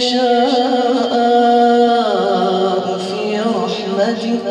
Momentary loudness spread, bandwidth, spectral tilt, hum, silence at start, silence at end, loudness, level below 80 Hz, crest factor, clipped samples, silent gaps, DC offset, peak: 8 LU; 10 kHz; -5 dB/octave; none; 0 s; 0 s; -15 LUFS; -66 dBFS; 12 dB; under 0.1%; none; under 0.1%; -2 dBFS